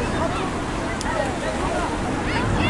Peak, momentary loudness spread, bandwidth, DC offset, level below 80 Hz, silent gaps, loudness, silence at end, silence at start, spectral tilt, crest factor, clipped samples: -8 dBFS; 3 LU; 11.5 kHz; under 0.1%; -34 dBFS; none; -24 LUFS; 0 s; 0 s; -5 dB/octave; 14 dB; under 0.1%